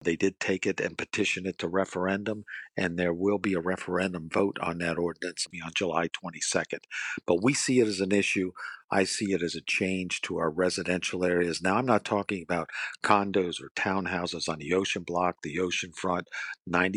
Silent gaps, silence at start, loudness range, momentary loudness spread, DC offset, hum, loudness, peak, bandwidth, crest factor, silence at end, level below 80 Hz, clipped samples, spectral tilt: 13.71-13.75 s; 0 s; 3 LU; 7 LU; under 0.1%; none; -29 LUFS; -6 dBFS; 11.5 kHz; 22 dB; 0 s; -64 dBFS; under 0.1%; -4 dB/octave